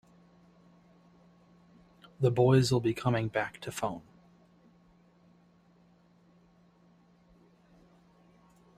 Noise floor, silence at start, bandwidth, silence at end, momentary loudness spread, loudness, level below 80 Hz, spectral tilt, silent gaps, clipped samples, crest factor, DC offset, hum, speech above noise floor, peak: -63 dBFS; 2.2 s; 14.5 kHz; 4.8 s; 13 LU; -29 LUFS; -64 dBFS; -6.5 dB/octave; none; under 0.1%; 22 dB; under 0.1%; none; 35 dB; -12 dBFS